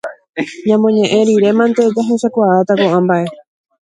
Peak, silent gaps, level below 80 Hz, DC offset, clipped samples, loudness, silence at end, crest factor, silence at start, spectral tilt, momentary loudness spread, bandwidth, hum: 0 dBFS; 0.29-0.33 s; -60 dBFS; under 0.1%; under 0.1%; -13 LUFS; 0.6 s; 12 dB; 0.05 s; -6.5 dB/octave; 11 LU; 10.5 kHz; none